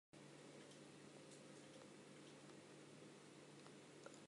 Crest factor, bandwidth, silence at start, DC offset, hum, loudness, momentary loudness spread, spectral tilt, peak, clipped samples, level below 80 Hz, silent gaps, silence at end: 20 dB; 11.5 kHz; 0.15 s; under 0.1%; none; -62 LUFS; 1 LU; -4 dB/octave; -42 dBFS; under 0.1%; under -90 dBFS; none; 0 s